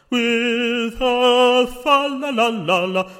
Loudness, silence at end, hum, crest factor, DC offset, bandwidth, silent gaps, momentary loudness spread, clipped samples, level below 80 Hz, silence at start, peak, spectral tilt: -17 LUFS; 0 s; none; 16 dB; under 0.1%; 16 kHz; none; 6 LU; under 0.1%; -46 dBFS; 0.1 s; -2 dBFS; -4 dB/octave